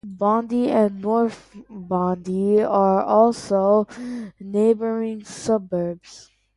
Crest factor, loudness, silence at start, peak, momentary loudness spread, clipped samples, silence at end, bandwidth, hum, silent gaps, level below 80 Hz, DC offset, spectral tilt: 16 dB; -21 LUFS; 0.05 s; -4 dBFS; 13 LU; under 0.1%; 0.35 s; 11.5 kHz; none; none; -60 dBFS; under 0.1%; -7 dB/octave